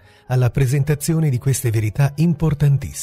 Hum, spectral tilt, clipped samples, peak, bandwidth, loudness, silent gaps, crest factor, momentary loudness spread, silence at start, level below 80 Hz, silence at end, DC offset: none; -6.5 dB/octave; under 0.1%; -6 dBFS; 16 kHz; -19 LUFS; none; 12 dB; 2 LU; 0.3 s; -38 dBFS; 0 s; under 0.1%